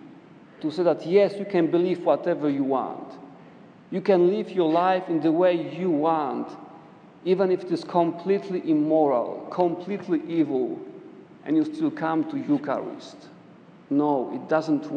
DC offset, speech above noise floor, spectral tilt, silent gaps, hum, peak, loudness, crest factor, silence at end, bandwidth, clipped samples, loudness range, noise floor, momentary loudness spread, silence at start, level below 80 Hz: under 0.1%; 26 dB; -8 dB/octave; none; none; -8 dBFS; -24 LUFS; 18 dB; 0 s; 9 kHz; under 0.1%; 4 LU; -49 dBFS; 13 LU; 0 s; -80 dBFS